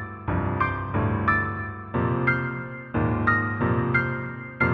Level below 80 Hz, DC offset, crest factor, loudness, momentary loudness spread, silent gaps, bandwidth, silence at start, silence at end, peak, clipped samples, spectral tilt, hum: -44 dBFS; under 0.1%; 18 dB; -25 LUFS; 8 LU; none; 5 kHz; 0 s; 0 s; -8 dBFS; under 0.1%; -10 dB/octave; none